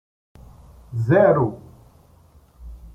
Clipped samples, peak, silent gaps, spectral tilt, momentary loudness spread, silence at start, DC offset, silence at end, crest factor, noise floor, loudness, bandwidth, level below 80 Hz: under 0.1%; -4 dBFS; none; -10 dB/octave; 26 LU; 0.9 s; under 0.1%; 0.1 s; 20 dB; -52 dBFS; -19 LUFS; 7.4 kHz; -46 dBFS